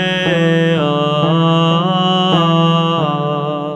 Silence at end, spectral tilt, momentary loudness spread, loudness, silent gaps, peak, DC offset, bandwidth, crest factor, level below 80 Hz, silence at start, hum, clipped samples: 0 s; -7 dB/octave; 4 LU; -14 LUFS; none; 0 dBFS; under 0.1%; 8.2 kHz; 12 dB; -52 dBFS; 0 s; none; under 0.1%